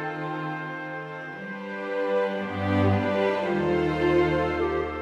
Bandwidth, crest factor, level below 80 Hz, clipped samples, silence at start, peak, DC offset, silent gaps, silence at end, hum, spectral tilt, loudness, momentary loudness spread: 8.8 kHz; 14 dB; -50 dBFS; under 0.1%; 0 s; -12 dBFS; under 0.1%; none; 0 s; none; -8 dB/octave; -26 LUFS; 12 LU